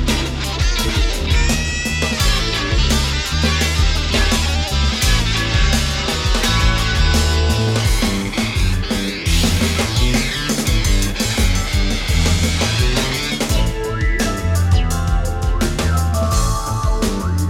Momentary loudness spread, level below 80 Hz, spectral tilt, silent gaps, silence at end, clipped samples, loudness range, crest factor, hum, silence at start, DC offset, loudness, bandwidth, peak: 4 LU; -20 dBFS; -4 dB/octave; none; 0 s; under 0.1%; 2 LU; 14 dB; none; 0 s; under 0.1%; -17 LUFS; 16.5 kHz; -2 dBFS